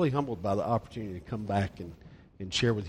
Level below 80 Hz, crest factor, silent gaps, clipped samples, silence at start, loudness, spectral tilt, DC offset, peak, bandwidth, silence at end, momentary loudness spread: -54 dBFS; 18 dB; none; under 0.1%; 0 s; -32 LUFS; -6 dB/octave; under 0.1%; -14 dBFS; 12 kHz; 0 s; 16 LU